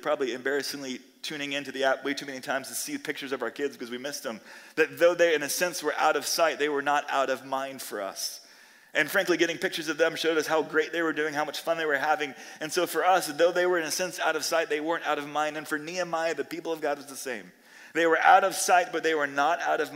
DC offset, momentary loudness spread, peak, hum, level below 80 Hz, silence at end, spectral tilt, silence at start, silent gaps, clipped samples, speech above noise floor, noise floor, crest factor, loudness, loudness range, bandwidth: under 0.1%; 11 LU; -6 dBFS; none; -84 dBFS; 0 s; -2 dB/octave; 0 s; none; under 0.1%; 27 dB; -54 dBFS; 22 dB; -27 LUFS; 6 LU; 16 kHz